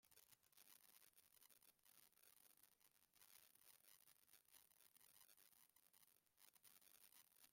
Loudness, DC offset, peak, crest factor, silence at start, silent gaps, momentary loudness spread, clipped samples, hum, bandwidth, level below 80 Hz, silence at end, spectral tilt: -69 LUFS; under 0.1%; -48 dBFS; 26 dB; 0 s; none; 1 LU; under 0.1%; none; 16.5 kHz; under -90 dBFS; 0 s; 0 dB/octave